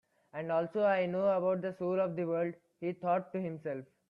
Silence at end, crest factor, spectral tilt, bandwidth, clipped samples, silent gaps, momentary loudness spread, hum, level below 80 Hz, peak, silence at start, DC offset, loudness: 0.25 s; 16 dB; -9 dB/octave; 5.4 kHz; under 0.1%; none; 11 LU; none; -78 dBFS; -18 dBFS; 0.35 s; under 0.1%; -34 LUFS